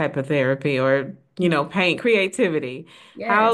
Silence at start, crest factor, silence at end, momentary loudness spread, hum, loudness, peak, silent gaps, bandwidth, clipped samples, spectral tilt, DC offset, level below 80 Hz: 0 s; 16 dB; 0 s; 13 LU; none; -21 LUFS; -4 dBFS; none; 12.5 kHz; under 0.1%; -6 dB/octave; under 0.1%; -66 dBFS